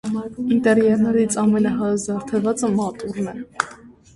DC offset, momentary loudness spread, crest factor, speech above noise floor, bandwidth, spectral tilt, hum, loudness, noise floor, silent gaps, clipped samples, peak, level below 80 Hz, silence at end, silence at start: under 0.1%; 11 LU; 20 dB; 24 dB; 11.5 kHz; -6 dB/octave; none; -20 LUFS; -43 dBFS; none; under 0.1%; 0 dBFS; -54 dBFS; 0.25 s; 0.05 s